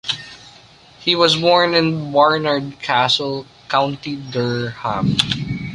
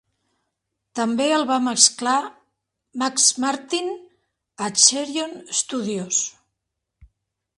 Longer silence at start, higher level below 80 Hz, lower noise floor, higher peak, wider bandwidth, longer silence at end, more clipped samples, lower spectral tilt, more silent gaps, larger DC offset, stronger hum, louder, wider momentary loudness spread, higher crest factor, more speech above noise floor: second, 0.05 s vs 0.95 s; first, -48 dBFS vs -66 dBFS; second, -46 dBFS vs -80 dBFS; about the same, 0 dBFS vs 0 dBFS; about the same, 11.5 kHz vs 11.5 kHz; second, 0 s vs 0.5 s; neither; first, -5 dB/octave vs -1 dB/octave; neither; neither; neither; first, -17 LUFS vs -20 LUFS; second, 11 LU vs 15 LU; second, 18 dB vs 24 dB; second, 28 dB vs 59 dB